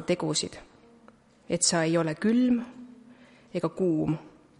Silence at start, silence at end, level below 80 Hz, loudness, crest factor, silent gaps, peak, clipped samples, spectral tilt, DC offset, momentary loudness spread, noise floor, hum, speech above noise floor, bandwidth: 0 s; 0.3 s; -62 dBFS; -27 LUFS; 20 dB; none; -10 dBFS; under 0.1%; -4 dB/octave; under 0.1%; 14 LU; -57 dBFS; none; 31 dB; 11.5 kHz